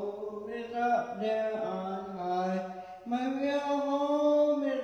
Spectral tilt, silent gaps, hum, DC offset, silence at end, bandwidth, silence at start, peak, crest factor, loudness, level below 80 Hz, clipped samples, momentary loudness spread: -6.5 dB/octave; none; none; under 0.1%; 0 s; 7.6 kHz; 0 s; -18 dBFS; 14 dB; -31 LUFS; -74 dBFS; under 0.1%; 11 LU